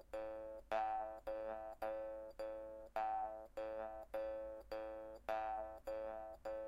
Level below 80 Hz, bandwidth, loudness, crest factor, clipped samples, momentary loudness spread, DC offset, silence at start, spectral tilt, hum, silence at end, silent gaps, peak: -66 dBFS; 16 kHz; -47 LUFS; 18 dB; under 0.1%; 7 LU; under 0.1%; 0 s; -5.5 dB/octave; none; 0 s; none; -28 dBFS